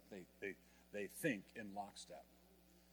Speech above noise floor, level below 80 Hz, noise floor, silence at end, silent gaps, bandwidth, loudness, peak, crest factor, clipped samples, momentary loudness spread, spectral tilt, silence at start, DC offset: 22 dB; -78 dBFS; -69 dBFS; 0 s; none; 19.5 kHz; -49 LUFS; -26 dBFS; 24 dB; under 0.1%; 25 LU; -4.5 dB/octave; 0 s; under 0.1%